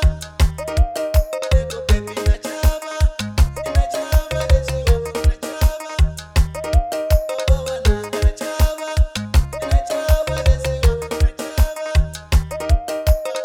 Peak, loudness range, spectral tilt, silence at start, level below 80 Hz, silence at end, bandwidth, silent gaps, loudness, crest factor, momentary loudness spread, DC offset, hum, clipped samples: -2 dBFS; 1 LU; -5.5 dB/octave; 0 s; -18 dBFS; 0 s; 19.5 kHz; none; -20 LUFS; 14 dB; 2 LU; under 0.1%; none; under 0.1%